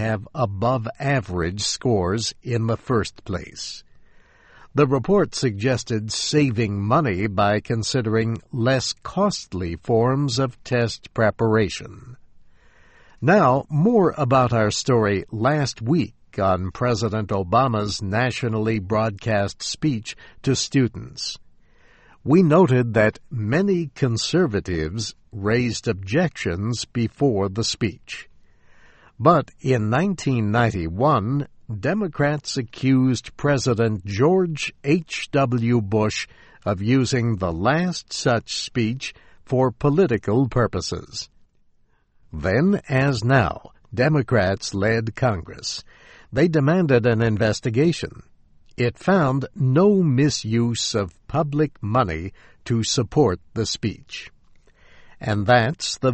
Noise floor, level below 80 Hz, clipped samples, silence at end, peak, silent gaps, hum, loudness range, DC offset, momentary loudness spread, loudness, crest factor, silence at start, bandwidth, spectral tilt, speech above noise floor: -59 dBFS; -46 dBFS; under 0.1%; 0 s; -2 dBFS; none; none; 3 LU; under 0.1%; 11 LU; -21 LUFS; 18 dB; 0 s; 8.8 kHz; -5.5 dB/octave; 39 dB